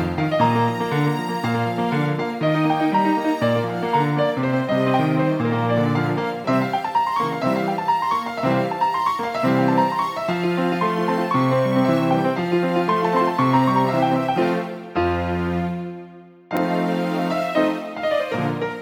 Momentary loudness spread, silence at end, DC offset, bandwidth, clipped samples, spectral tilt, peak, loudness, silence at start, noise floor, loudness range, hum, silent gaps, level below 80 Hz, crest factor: 5 LU; 0 s; under 0.1%; 18 kHz; under 0.1%; -7 dB/octave; -4 dBFS; -21 LUFS; 0 s; -42 dBFS; 4 LU; none; none; -52 dBFS; 16 dB